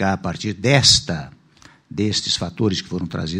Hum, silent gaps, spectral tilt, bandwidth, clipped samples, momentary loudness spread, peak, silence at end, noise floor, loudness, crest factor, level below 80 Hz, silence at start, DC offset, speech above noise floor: none; none; -3.5 dB/octave; 16 kHz; under 0.1%; 15 LU; 0 dBFS; 0 s; -50 dBFS; -18 LUFS; 20 dB; -46 dBFS; 0 s; under 0.1%; 30 dB